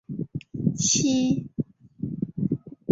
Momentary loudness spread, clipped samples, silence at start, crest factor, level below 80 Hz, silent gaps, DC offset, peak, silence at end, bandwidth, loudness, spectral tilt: 14 LU; under 0.1%; 0.1 s; 18 dB; -56 dBFS; none; under 0.1%; -8 dBFS; 0 s; 7.8 kHz; -26 LUFS; -4.5 dB/octave